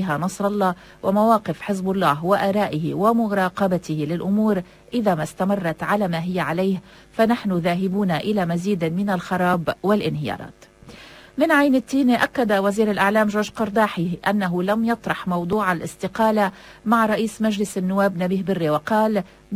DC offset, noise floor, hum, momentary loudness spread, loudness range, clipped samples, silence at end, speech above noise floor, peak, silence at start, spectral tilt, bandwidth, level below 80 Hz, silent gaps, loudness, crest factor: under 0.1%; -43 dBFS; none; 6 LU; 3 LU; under 0.1%; 0 s; 23 dB; -4 dBFS; 0 s; -6.5 dB/octave; 16 kHz; -54 dBFS; none; -21 LUFS; 16 dB